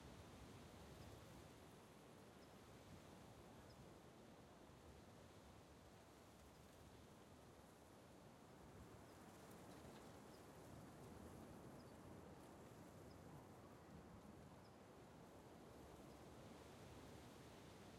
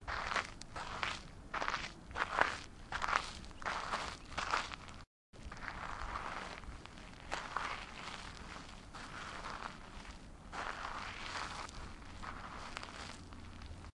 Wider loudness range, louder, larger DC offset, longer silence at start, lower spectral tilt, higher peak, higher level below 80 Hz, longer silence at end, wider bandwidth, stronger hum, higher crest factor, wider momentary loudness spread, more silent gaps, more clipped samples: second, 4 LU vs 7 LU; second, -63 LUFS vs -42 LUFS; neither; about the same, 0 s vs 0 s; first, -5 dB/octave vs -3 dB/octave; second, -48 dBFS vs -10 dBFS; second, -74 dBFS vs -54 dBFS; about the same, 0 s vs 0.05 s; first, 15.5 kHz vs 11.5 kHz; neither; second, 14 dB vs 34 dB; second, 4 LU vs 15 LU; second, none vs 5.07-5.33 s; neither